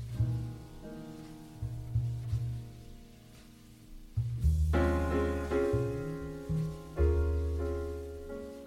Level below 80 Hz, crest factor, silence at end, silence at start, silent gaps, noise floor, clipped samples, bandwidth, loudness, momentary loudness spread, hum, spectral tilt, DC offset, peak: -38 dBFS; 16 dB; 0 s; 0 s; none; -54 dBFS; under 0.1%; 13.5 kHz; -34 LUFS; 19 LU; none; -8 dB/octave; under 0.1%; -16 dBFS